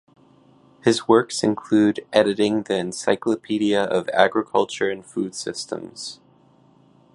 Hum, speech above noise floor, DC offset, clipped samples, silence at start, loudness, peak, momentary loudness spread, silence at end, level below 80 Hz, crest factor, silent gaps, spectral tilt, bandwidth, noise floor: none; 34 dB; under 0.1%; under 0.1%; 0.85 s; -21 LUFS; 0 dBFS; 11 LU; 1 s; -64 dBFS; 22 dB; none; -4.5 dB/octave; 11.5 kHz; -55 dBFS